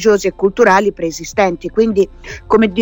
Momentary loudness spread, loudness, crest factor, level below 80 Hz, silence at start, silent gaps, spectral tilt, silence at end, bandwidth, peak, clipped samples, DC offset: 9 LU; -14 LUFS; 14 dB; -40 dBFS; 0 s; none; -5 dB/octave; 0 s; 17.5 kHz; 0 dBFS; under 0.1%; under 0.1%